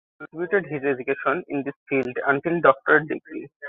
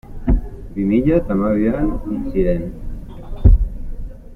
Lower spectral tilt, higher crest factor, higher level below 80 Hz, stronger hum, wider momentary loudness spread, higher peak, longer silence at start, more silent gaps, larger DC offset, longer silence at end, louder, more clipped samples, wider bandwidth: second, -9 dB/octave vs -11 dB/octave; first, 22 dB vs 16 dB; second, -66 dBFS vs -22 dBFS; neither; second, 13 LU vs 19 LU; about the same, -2 dBFS vs -2 dBFS; first, 0.2 s vs 0.05 s; first, 1.76-1.86 s, 3.56-3.60 s vs none; neither; about the same, 0 s vs 0 s; second, -23 LUFS vs -19 LUFS; neither; about the same, 4 kHz vs 4 kHz